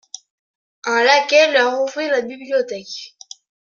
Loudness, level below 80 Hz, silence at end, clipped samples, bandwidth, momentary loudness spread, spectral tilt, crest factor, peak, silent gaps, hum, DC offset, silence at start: -16 LUFS; -74 dBFS; 0.6 s; under 0.1%; 7.4 kHz; 21 LU; -1 dB/octave; 18 dB; -2 dBFS; none; none; under 0.1%; 0.85 s